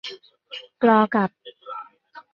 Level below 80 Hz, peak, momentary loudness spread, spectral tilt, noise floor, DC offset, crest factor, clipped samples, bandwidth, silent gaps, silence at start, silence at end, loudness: -70 dBFS; -4 dBFS; 22 LU; -7 dB/octave; -48 dBFS; under 0.1%; 20 dB; under 0.1%; 6.8 kHz; none; 0.05 s; 0.15 s; -20 LUFS